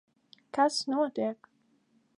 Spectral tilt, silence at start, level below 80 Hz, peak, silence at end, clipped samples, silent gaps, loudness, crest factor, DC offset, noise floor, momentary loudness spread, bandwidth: -3 dB/octave; 0.55 s; -84 dBFS; -14 dBFS; 0.85 s; under 0.1%; none; -30 LUFS; 20 dB; under 0.1%; -69 dBFS; 10 LU; 11.5 kHz